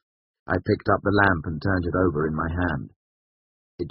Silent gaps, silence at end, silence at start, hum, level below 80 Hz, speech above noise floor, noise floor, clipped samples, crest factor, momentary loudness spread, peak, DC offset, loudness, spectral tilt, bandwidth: 2.96-3.78 s; 0 s; 0.45 s; none; -44 dBFS; over 67 dB; under -90 dBFS; under 0.1%; 22 dB; 10 LU; -4 dBFS; under 0.1%; -24 LUFS; -6 dB/octave; 5.6 kHz